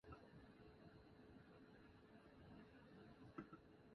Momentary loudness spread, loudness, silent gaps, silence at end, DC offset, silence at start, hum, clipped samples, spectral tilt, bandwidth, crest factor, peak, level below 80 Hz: 7 LU; -65 LUFS; none; 0 s; under 0.1%; 0.05 s; none; under 0.1%; -6 dB/octave; 5.8 kHz; 24 dB; -40 dBFS; -76 dBFS